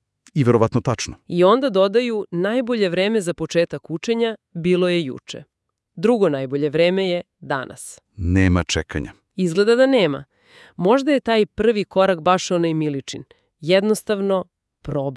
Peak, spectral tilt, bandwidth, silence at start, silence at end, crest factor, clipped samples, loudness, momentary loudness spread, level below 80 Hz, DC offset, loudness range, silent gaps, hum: -2 dBFS; -6 dB/octave; 12 kHz; 0.35 s; 0 s; 16 dB; under 0.1%; -20 LUFS; 13 LU; -48 dBFS; under 0.1%; 3 LU; none; none